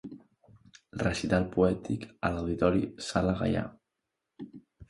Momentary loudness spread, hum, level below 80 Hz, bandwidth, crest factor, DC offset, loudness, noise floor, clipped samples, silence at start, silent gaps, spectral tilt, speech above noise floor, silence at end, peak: 20 LU; none; -48 dBFS; 11.5 kHz; 20 dB; under 0.1%; -30 LUFS; -85 dBFS; under 0.1%; 0.05 s; none; -6.5 dB/octave; 56 dB; 0.05 s; -12 dBFS